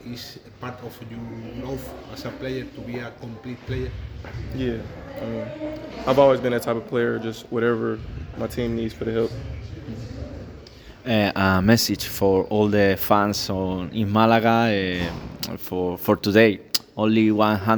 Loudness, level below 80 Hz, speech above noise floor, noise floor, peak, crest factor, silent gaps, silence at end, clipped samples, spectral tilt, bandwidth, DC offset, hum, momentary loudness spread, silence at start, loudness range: -22 LUFS; -44 dBFS; 21 dB; -43 dBFS; 0 dBFS; 22 dB; none; 0 s; under 0.1%; -5.5 dB/octave; over 20 kHz; under 0.1%; none; 18 LU; 0 s; 12 LU